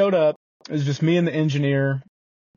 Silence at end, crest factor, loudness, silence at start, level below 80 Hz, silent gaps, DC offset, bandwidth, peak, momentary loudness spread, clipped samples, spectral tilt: 0.55 s; 14 dB; -22 LUFS; 0 s; -64 dBFS; 0.36-0.60 s; under 0.1%; 7.2 kHz; -8 dBFS; 10 LU; under 0.1%; -6.5 dB/octave